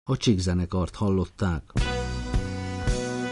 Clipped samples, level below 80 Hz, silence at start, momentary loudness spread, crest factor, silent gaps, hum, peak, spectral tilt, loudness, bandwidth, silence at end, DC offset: under 0.1%; -32 dBFS; 0.05 s; 6 LU; 16 dB; none; none; -10 dBFS; -6 dB/octave; -27 LUFS; 11.5 kHz; 0 s; under 0.1%